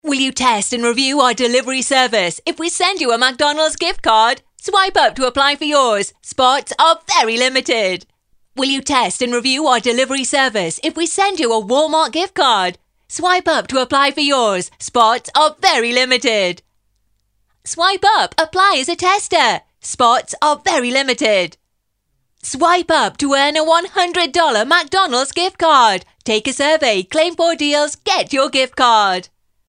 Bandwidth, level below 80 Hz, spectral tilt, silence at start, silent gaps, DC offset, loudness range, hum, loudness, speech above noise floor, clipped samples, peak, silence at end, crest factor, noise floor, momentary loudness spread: 13 kHz; -52 dBFS; -1.5 dB/octave; 0.05 s; none; under 0.1%; 2 LU; none; -14 LUFS; 54 dB; under 0.1%; 0 dBFS; 0.45 s; 16 dB; -69 dBFS; 6 LU